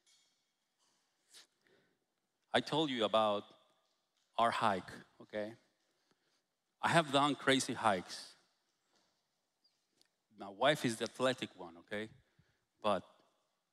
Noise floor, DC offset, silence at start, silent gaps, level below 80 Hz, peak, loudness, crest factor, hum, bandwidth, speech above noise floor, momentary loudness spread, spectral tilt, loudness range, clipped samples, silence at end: -85 dBFS; under 0.1%; 1.35 s; none; -80 dBFS; -16 dBFS; -35 LUFS; 24 dB; none; 15 kHz; 50 dB; 16 LU; -4 dB/octave; 5 LU; under 0.1%; 0.7 s